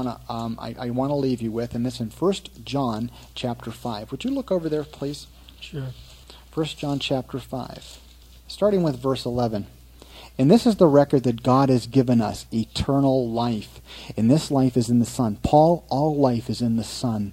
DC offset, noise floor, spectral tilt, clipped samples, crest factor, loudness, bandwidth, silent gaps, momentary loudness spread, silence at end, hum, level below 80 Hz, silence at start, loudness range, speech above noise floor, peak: under 0.1%; -46 dBFS; -7 dB/octave; under 0.1%; 20 dB; -23 LUFS; 16 kHz; none; 16 LU; 0 s; none; -46 dBFS; 0 s; 10 LU; 24 dB; -2 dBFS